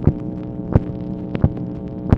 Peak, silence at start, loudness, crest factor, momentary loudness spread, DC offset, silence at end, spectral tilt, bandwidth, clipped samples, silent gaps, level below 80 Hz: 0 dBFS; 0 s; -23 LUFS; 20 dB; 8 LU; under 0.1%; 0 s; -11 dB/octave; 5.2 kHz; under 0.1%; none; -32 dBFS